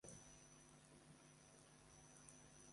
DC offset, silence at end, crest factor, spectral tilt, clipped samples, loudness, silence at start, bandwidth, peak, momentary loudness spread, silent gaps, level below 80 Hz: under 0.1%; 0 s; 22 dB; -3 dB/octave; under 0.1%; -65 LUFS; 0 s; 11.5 kHz; -44 dBFS; 4 LU; none; -80 dBFS